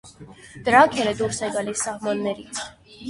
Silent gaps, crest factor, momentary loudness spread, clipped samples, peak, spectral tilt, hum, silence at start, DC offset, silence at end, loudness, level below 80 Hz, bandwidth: none; 22 dB; 16 LU; under 0.1%; -2 dBFS; -3.5 dB/octave; none; 0.05 s; under 0.1%; 0 s; -22 LUFS; -56 dBFS; 11.5 kHz